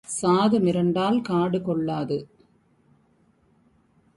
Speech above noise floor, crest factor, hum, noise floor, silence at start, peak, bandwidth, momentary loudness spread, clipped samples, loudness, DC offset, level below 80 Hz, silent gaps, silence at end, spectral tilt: 40 dB; 16 dB; none; -63 dBFS; 0.1 s; -8 dBFS; 11.5 kHz; 8 LU; under 0.1%; -23 LUFS; under 0.1%; -62 dBFS; none; 1.9 s; -6 dB/octave